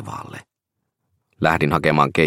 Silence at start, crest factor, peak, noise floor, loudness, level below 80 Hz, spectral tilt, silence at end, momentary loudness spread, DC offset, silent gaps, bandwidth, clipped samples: 0 s; 20 dB; -2 dBFS; -79 dBFS; -18 LUFS; -48 dBFS; -6.5 dB/octave; 0 s; 20 LU; under 0.1%; none; 16 kHz; under 0.1%